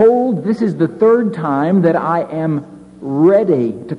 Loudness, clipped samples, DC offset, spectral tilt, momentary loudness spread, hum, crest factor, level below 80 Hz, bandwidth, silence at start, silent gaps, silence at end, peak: -15 LUFS; under 0.1%; under 0.1%; -9.5 dB/octave; 8 LU; none; 12 dB; -56 dBFS; 6 kHz; 0 s; none; 0 s; -2 dBFS